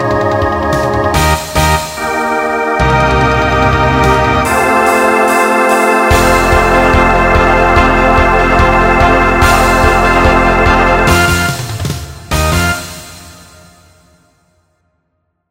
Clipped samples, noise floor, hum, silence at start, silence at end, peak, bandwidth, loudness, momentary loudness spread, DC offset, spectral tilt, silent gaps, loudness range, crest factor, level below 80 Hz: 0.2%; -65 dBFS; none; 0 s; 2.2 s; 0 dBFS; 16.5 kHz; -10 LUFS; 7 LU; under 0.1%; -5 dB/octave; none; 8 LU; 10 dB; -20 dBFS